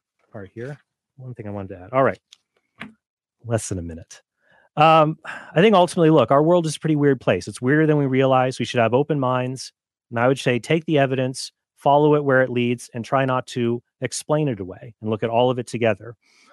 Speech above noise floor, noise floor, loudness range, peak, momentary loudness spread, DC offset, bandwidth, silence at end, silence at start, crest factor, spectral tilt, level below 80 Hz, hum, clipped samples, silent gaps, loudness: 40 dB; -60 dBFS; 10 LU; -4 dBFS; 19 LU; under 0.1%; 12 kHz; 0.4 s; 0.35 s; 18 dB; -6 dB/octave; -58 dBFS; none; under 0.1%; 3.10-3.17 s; -20 LUFS